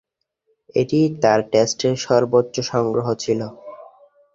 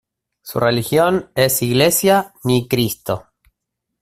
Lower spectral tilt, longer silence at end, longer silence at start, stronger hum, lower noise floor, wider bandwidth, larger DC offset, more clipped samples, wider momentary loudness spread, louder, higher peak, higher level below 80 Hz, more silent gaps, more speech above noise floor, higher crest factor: about the same, -5 dB/octave vs -4.5 dB/octave; second, 0.5 s vs 0.8 s; first, 0.75 s vs 0.45 s; neither; second, -69 dBFS vs -78 dBFS; second, 7.8 kHz vs 16 kHz; neither; neither; second, 8 LU vs 11 LU; about the same, -19 LUFS vs -17 LUFS; about the same, -2 dBFS vs 0 dBFS; second, -58 dBFS vs -50 dBFS; neither; second, 50 dB vs 62 dB; about the same, 18 dB vs 18 dB